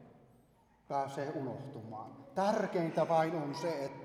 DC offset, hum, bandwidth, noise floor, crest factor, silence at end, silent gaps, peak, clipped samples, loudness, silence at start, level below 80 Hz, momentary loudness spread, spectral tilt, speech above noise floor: under 0.1%; none; 14 kHz; -67 dBFS; 18 dB; 0 s; none; -18 dBFS; under 0.1%; -36 LUFS; 0 s; -78 dBFS; 15 LU; -6.5 dB/octave; 32 dB